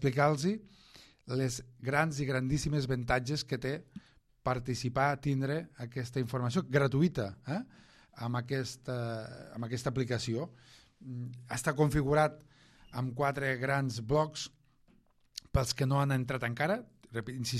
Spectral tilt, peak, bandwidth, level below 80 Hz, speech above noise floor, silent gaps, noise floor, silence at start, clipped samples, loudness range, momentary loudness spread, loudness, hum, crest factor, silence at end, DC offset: -6 dB/octave; -12 dBFS; 14 kHz; -54 dBFS; 34 dB; none; -67 dBFS; 0 s; under 0.1%; 5 LU; 13 LU; -33 LUFS; none; 20 dB; 0 s; under 0.1%